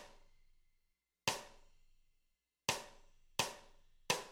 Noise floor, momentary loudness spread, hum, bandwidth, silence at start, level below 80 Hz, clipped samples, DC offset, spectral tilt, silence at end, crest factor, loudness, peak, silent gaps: -83 dBFS; 19 LU; none; 16 kHz; 0 s; -68 dBFS; under 0.1%; under 0.1%; -1.5 dB/octave; 0 s; 30 dB; -41 LUFS; -16 dBFS; none